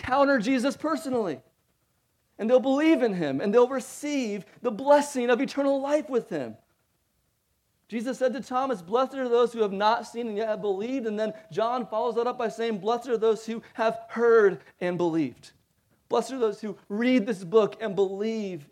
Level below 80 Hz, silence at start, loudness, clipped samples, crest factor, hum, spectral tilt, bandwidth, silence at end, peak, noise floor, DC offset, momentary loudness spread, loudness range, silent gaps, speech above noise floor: -68 dBFS; 0 s; -26 LUFS; under 0.1%; 20 dB; none; -5.5 dB/octave; 14 kHz; 0.1 s; -6 dBFS; -73 dBFS; under 0.1%; 11 LU; 5 LU; none; 47 dB